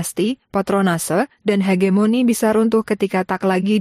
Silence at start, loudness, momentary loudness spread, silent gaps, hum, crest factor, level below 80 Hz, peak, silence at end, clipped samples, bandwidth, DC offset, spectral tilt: 0 s; -18 LUFS; 5 LU; none; none; 12 dB; -56 dBFS; -6 dBFS; 0 s; under 0.1%; 15.5 kHz; under 0.1%; -5.5 dB/octave